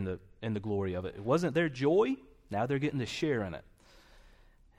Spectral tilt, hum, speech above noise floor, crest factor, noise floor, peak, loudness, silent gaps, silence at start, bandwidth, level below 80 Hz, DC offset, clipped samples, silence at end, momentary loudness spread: -6.5 dB/octave; none; 29 dB; 16 dB; -60 dBFS; -16 dBFS; -32 LUFS; none; 0 s; 13.5 kHz; -60 dBFS; under 0.1%; under 0.1%; 0.55 s; 12 LU